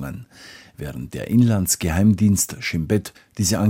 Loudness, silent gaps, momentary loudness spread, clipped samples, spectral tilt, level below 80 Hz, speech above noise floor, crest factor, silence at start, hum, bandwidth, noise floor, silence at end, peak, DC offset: -20 LUFS; none; 19 LU; under 0.1%; -5 dB/octave; -42 dBFS; 25 dB; 16 dB; 0 s; none; 16.5 kHz; -45 dBFS; 0 s; -6 dBFS; under 0.1%